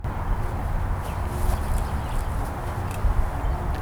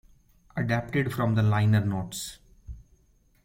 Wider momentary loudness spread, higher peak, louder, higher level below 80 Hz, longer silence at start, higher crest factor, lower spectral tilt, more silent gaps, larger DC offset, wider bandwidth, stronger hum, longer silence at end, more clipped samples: second, 3 LU vs 22 LU; about the same, -10 dBFS vs -10 dBFS; about the same, -28 LUFS vs -27 LUFS; first, -26 dBFS vs -50 dBFS; second, 0 s vs 0.55 s; about the same, 16 dB vs 18 dB; about the same, -6.5 dB/octave vs -6.5 dB/octave; neither; neither; first, over 20 kHz vs 16.5 kHz; neither; second, 0 s vs 0.65 s; neither